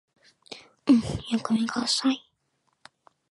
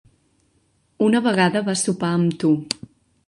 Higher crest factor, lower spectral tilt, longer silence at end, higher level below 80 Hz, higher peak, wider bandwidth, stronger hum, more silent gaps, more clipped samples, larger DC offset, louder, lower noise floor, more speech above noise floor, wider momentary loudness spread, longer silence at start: about the same, 20 dB vs 20 dB; about the same, -4 dB/octave vs -5 dB/octave; first, 1.1 s vs 0.55 s; first, -54 dBFS vs -62 dBFS; second, -8 dBFS vs -2 dBFS; about the same, 11.5 kHz vs 11.5 kHz; neither; neither; neither; neither; second, -25 LUFS vs -20 LUFS; first, -74 dBFS vs -64 dBFS; first, 49 dB vs 44 dB; first, 22 LU vs 5 LU; second, 0.5 s vs 1 s